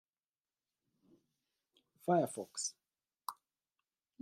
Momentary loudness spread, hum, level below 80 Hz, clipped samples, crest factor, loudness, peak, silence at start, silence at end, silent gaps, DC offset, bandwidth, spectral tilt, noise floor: 15 LU; none; under -90 dBFS; under 0.1%; 24 dB; -38 LUFS; -20 dBFS; 2.05 s; 0.9 s; none; under 0.1%; 15.5 kHz; -4.5 dB/octave; under -90 dBFS